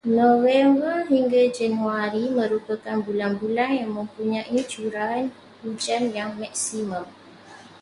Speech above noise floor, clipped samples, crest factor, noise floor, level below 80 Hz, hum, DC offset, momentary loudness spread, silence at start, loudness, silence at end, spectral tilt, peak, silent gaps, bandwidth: 23 dB; under 0.1%; 16 dB; -46 dBFS; -66 dBFS; none; under 0.1%; 12 LU; 0.05 s; -23 LUFS; 0.2 s; -4.5 dB/octave; -6 dBFS; none; 11.5 kHz